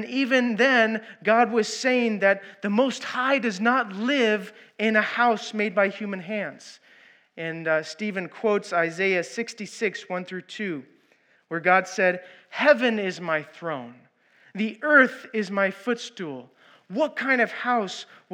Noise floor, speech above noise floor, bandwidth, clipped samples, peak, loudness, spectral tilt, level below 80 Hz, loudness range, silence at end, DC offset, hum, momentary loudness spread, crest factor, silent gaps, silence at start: -62 dBFS; 38 dB; 11.5 kHz; under 0.1%; -4 dBFS; -24 LUFS; -4.5 dB/octave; under -90 dBFS; 5 LU; 0.3 s; under 0.1%; none; 14 LU; 20 dB; none; 0 s